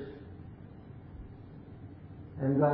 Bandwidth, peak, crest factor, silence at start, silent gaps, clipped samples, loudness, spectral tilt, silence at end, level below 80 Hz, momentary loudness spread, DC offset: 4.5 kHz; -16 dBFS; 20 dB; 0 s; none; under 0.1%; -38 LUFS; -12 dB/octave; 0 s; -56 dBFS; 18 LU; under 0.1%